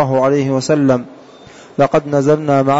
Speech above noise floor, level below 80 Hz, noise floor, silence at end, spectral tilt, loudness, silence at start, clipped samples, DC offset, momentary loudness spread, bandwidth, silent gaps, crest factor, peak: 26 dB; -50 dBFS; -39 dBFS; 0 s; -7 dB/octave; -14 LUFS; 0 s; under 0.1%; under 0.1%; 6 LU; 8 kHz; none; 10 dB; -4 dBFS